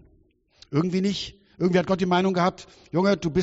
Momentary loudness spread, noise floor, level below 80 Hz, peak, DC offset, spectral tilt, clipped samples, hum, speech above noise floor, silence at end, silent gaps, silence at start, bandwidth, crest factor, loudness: 9 LU; -61 dBFS; -54 dBFS; -8 dBFS; under 0.1%; -5.5 dB/octave; under 0.1%; none; 38 dB; 0 s; none; 0.7 s; 8 kHz; 16 dB; -24 LUFS